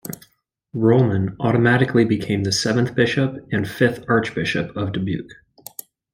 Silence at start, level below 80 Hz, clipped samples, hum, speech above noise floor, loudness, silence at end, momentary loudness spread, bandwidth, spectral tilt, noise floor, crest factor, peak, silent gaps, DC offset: 0.05 s; -54 dBFS; under 0.1%; none; 42 dB; -20 LUFS; 0.8 s; 19 LU; 16.5 kHz; -6 dB/octave; -61 dBFS; 18 dB; -2 dBFS; none; under 0.1%